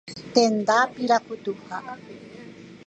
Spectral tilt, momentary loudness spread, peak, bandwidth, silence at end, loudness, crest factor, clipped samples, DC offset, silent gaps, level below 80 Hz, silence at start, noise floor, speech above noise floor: -3.5 dB/octave; 23 LU; -4 dBFS; 9.4 kHz; 0.1 s; -23 LUFS; 22 dB; under 0.1%; under 0.1%; none; -68 dBFS; 0.05 s; -43 dBFS; 20 dB